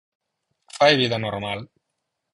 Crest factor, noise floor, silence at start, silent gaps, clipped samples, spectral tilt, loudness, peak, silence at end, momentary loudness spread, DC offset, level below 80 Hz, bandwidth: 22 dB; -79 dBFS; 0.75 s; none; under 0.1%; -4.5 dB/octave; -21 LUFS; -4 dBFS; 0.7 s; 16 LU; under 0.1%; -58 dBFS; 11.5 kHz